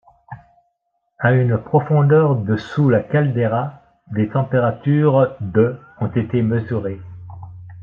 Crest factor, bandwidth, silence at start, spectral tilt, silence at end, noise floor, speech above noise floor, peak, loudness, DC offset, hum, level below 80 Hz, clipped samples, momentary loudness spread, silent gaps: 16 dB; 5.4 kHz; 0.3 s; -10 dB/octave; 0 s; -71 dBFS; 54 dB; -4 dBFS; -18 LUFS; under 0.1%; none; -54 dBFS; under 0.1%; 15 LU; none